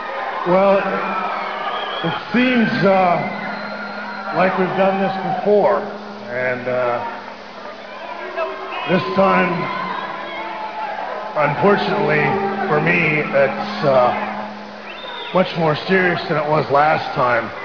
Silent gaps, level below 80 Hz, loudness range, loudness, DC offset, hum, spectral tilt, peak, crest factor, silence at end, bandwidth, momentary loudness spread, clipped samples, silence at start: none; -56 dBFS; 4 LU; -18 LUFS; 0.4%; none; -7 dB/octave; -2 dBFS; 16 dB; 0 s; 5.4 kHz; 13 LU; under 0.1%; 0 s